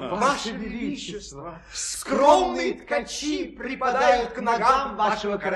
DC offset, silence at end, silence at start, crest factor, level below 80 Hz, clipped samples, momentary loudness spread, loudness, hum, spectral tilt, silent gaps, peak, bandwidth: under 0.1%; 0 s; 0 s; 20 dB; -50 dBFS; under 0.1%; 14 LU; -23 LUFS; none; -3 dB/octave; none; -4 dBFS; 13 kHz